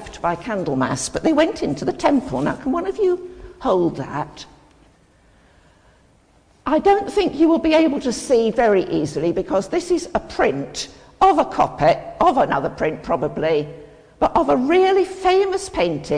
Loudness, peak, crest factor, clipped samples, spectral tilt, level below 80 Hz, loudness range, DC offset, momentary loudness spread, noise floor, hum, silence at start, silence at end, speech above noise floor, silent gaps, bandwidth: -19 LUFS; -4 dBFS; 16 dB; under 0.1%; -5 dB/octave; -44 dBFS; 6 LU; under 0.1%; 10 LU; -55 dBFS; none; 0 s; 0 s; 36 dB; none; 10.5 kHz